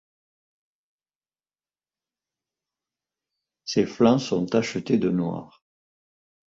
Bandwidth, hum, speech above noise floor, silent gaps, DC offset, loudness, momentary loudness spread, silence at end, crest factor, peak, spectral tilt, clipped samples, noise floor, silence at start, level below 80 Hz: 7.8 kHz; none; over 67 dB; none; under 0.1%; -23 LUFS; 11 LU; 1 s; 22 dB; -6 dBFS; -6 dB/octave; under 0.1%; under -90 dBFS; 3.65 s; -64 dBFS